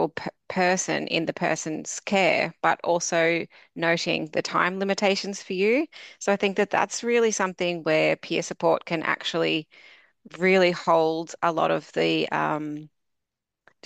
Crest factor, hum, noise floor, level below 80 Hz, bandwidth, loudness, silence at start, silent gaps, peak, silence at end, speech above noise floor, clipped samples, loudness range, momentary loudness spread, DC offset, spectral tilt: 20 dB; none; -85 dBFS; -72 dBFS; 13.5 kHz; -24 LUFS; 0 s; none; -6 dBFS; 1 s; 61 dB; under 0.1%; 1 LU; 7 LU; under 0.1%; -4 dB/octave